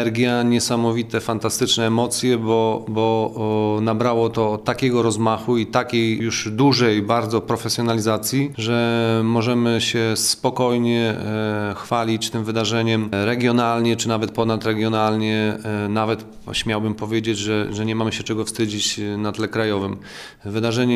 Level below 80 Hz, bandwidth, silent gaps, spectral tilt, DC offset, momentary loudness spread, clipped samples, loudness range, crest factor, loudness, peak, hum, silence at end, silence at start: -52 dBFS; 15 kHz; none; -5 dB/octave; under 0.1%; 5 LU; under 0.1%; 3 LU; 18 dB; -20 LUFS; -2 dBFS; none; 0 s; 0 s